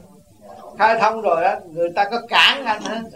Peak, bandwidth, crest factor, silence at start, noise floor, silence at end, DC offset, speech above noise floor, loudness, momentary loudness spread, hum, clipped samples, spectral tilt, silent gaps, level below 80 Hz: 0 dBFS; 16 kHz; 18 dB; 0.45 s; -46 dBFS; 0 s; 0.1%; 27 dB; -17 LUFS; 10 LU; none; under 0.1%; -2.5 dB/octave; none; -60 dBFS